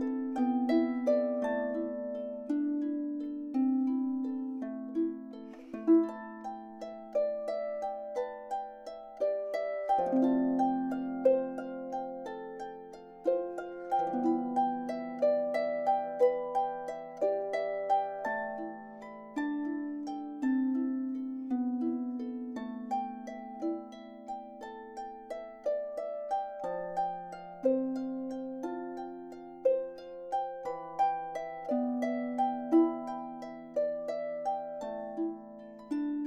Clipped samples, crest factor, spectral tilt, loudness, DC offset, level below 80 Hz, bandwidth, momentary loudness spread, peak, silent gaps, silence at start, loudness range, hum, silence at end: under 0.1%; 18 dB; -7 dB/octave; -33 LUFS; under 0.1%; -72 dBFS; 8.6 kHz; 15 LU; -14 dBFS; none; 0 s; 6 LU; none; 0 s